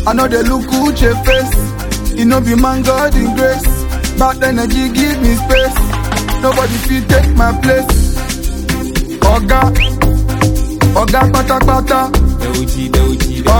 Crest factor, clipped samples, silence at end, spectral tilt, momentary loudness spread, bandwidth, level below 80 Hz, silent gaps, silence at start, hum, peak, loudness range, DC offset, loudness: 10 dB; under 0.1%; 0 s; -5.5 dB/octave; 6 LU; 19 kHz; -16 dBFS; none; 0 s; none; 0 dBFS; 1 LU; under 0.1%; -12 LUFS